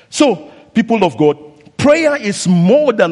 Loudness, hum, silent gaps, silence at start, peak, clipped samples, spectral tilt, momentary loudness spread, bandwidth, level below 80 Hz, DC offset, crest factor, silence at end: -13 LUFS; none; none; 0.1 s; 0 dBFS; under 0.1%; -5.5 dB/octave; 10 LU; 11.5 kHz; -52 dBFS; under 0.1%; 12 dB; 0 s